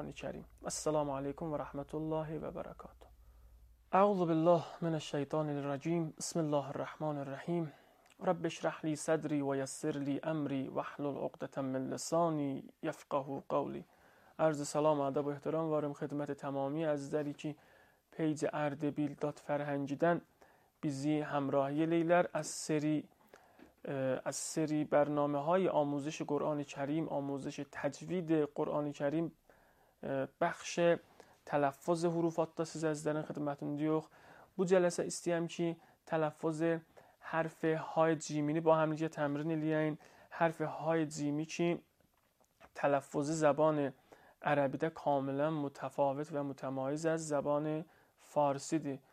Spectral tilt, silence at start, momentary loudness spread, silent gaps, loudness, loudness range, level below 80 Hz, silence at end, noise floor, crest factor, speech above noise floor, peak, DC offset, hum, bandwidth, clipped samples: -6 dB/octave; 0 s; 10 LU; none; -36 LUFS; 4 LU; -70 dBFS; 0.15 s; -74 dBFS; 20 dB; 39 dB; -16 dBFS; under 0.1%; none; 14.5 kHz; under 0.1%